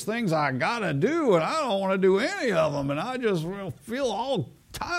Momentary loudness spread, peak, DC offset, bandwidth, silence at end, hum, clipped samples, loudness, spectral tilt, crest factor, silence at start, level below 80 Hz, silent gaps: 10 LU; -10 dBFS; under 0.1%; 15.5 kHz; 0 s; none; under 0.1%; -26 LUFS; -5.5 dB/octave; 16 dB; 0 s; -56 dBFS; none